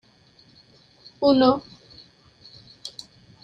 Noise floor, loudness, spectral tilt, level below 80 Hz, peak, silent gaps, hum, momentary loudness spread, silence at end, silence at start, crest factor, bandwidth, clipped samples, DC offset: -56 dBFS; -20 LUFS; -6 dB/octave; -60 dBFS; -4 dBFS; none; none; 27 LU; 0.55 s; 1.2 s; 22 dB; 9.2 kHz; under 0.1%; under 0.1%